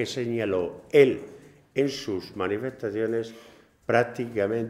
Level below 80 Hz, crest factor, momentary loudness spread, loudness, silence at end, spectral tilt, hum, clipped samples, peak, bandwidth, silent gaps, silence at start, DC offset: -64 dBFS; 22 dB; 13 LU; -26 LUFS; 0 s; -6 dB/octave; none; under 0.1%; -4 dBFS; 14 kHz; none; 0 s; under 0.1%